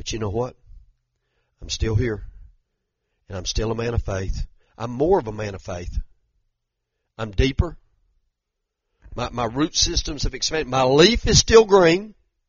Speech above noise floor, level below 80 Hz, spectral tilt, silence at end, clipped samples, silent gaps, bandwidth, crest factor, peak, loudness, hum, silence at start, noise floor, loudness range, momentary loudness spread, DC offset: 60 dB; -32 dBFS; -4 dB/octave; 0.4 s; under 0.1%; none; 7.4 kHz; 22 dB; 0 dBFS; -20 LUFS; none; 0 s; -80 dBFS; 12 LU; 19 LU; under 0.1%